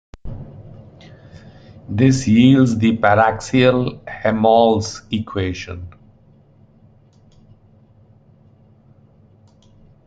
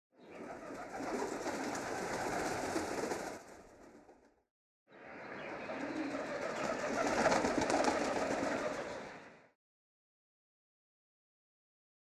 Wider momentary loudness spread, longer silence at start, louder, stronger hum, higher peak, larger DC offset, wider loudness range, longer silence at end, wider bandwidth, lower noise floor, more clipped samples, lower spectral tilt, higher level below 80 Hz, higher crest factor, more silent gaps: first, 22 LU vs 19 LU; about the same, 0.25 s vs 0.2 s; first, -16 LUFS vs -37 LUFS; neither; first, -2 dBFS vs -16 dBFS; neither; first, 15 LU vs 10 LU; first, 4.2 s vs 2.65 s; second, 9.2 kHz vs 16 kHz; second, -50 dBFS vs -64 dBFS; neither; first, -6.5 dB/octave vs -3.5 dB/octave; first, -46 dBFS vs -66 dBFS; second, 18 dB vs 24 dB; second, none vs 4.51-4.86 s